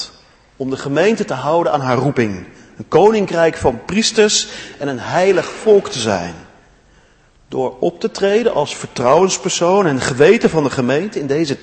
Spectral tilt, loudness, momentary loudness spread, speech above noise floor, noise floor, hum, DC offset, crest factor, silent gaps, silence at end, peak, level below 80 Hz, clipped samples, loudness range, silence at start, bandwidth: -4.5 dB/octave; -15 LUFS; 11 LU; 36 dB; -51 dBFS; none; under 0.1%; 16 dB; none; 0.05 s; 0 dBFS; -46 dBFS; under 0.1%; 4 LU; 0 s; 8.8 kHz